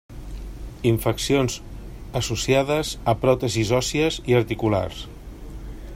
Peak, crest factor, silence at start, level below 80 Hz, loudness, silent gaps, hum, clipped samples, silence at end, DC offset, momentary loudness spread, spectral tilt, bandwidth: -4 dBFS; 20 dB; 0.1 s; -38 dBFS; -22 LUFS; none; none; under 0.1%; 0 s; under 0.1%; 19 LU; -5 dB/octave; 16 kHz